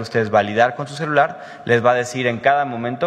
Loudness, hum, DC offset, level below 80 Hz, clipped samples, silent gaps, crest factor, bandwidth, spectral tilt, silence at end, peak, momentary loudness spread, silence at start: -18 LUFS; none; under 0.1%; -62 dBFS; under 0.1%; none; 16 dB; 12 kHz; -5.5 dB/octave; 0 s; -2 dBFS; 7 LU; 0 s